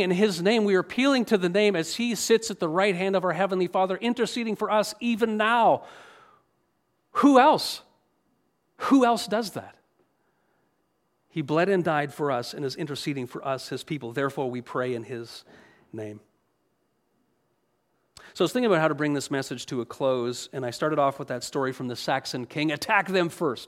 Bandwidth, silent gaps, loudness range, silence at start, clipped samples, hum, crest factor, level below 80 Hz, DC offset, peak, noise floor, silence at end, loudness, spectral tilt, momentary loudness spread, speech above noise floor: 16 kHz; none; 10 LU; 0 s; under 0.1%; none; 22 dB; -72 dBFS; under 0.1%; -6 dBFS; -72 dBFS; 0 s; -25 LUFS; -5 dB/octave; 12 LU; 48 dB